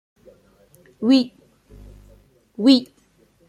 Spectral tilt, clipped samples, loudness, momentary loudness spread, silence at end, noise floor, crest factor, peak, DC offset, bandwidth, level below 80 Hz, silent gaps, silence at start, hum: -5 dB/octave; under 0.1%; -18 LUFS; 14 LU; 0.65 s; -58 dBFS; 20 dB; -4 dBFS; under 0.1%; 10 kHz; -54 dBFS; none; 1 s; 50 Hz at -55 dBFS